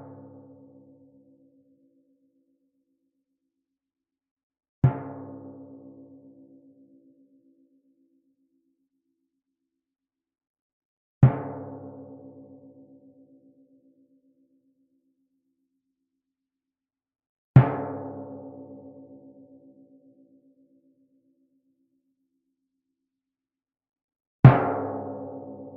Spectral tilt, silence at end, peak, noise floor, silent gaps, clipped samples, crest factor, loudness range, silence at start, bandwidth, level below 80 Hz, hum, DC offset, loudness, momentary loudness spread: -9.5 dB/octave; 0.1 s; 0 dBFS; under -90 dBFS; 10.47-10.54 s, 10.61-11.21 s, 17.29-17.54 s, 24.04-24.08 s, 24.20-24.43 s; under 0.1%; 30 dB; 22 LU; 4.85 s; 3.9 kHz; -58 dBFS; none; under 0.1%; -23 LUFS; 30 LU